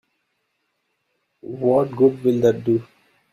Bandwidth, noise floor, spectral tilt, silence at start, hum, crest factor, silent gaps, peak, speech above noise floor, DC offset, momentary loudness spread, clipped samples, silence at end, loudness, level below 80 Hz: 13.5 kHz; -73 dBFS; -8.5 dB/octave; 1.45 s; none; 18 dB; none; -4 dBFS; 54 dB; under 0.1%; 7 LU; under 0.1%; 0.5 s; -19 LUFS; -60 dBFS